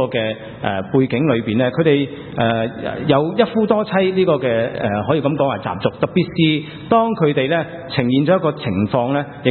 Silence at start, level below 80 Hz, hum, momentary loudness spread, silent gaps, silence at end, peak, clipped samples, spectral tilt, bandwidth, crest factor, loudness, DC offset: 0 s; -52 dBFS; none; 6 LU; none; 0 s; 0 dBFS; under 0.1%; -11 dB/octave; 4.4 kHz; 18 dB; -18 LUFS; under 0.1%